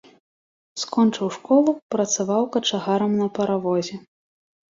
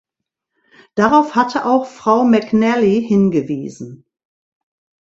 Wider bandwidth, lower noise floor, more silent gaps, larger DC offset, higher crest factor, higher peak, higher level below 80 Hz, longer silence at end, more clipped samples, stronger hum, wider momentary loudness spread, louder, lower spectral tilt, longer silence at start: about the same, 7.8 kHz vs 7.8 kHz; first, under -90 dBFS vs -80 dBFS; first, 1.82-1.89 s vs none; neither; about the same, 16 dB vs 16 dB; second, -6 dBFS vs 0 dBFS; second, -68 dBFS vs -56 dBFS; second, 0.7 s vs 1.1 s; neither; neither; about the same, 11 LU vs 13 LU; second, -22 LUFS vs -15 LUFS; second, -4.5 dB/octave vs -7 dB/octave; second, 0.75 s vs 0.95 s